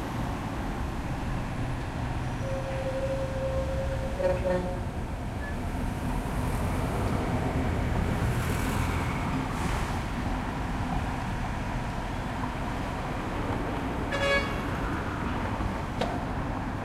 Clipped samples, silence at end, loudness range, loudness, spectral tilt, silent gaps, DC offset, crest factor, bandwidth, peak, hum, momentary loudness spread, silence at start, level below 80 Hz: under 0.1%; 0 s; 3 LU; -31 LUFS; -6.5 dB/octave; none; under 0.1%; 16 dB; 16 kHz; -14 dBFS; none; 5 LU; 0 s; -36 dBFS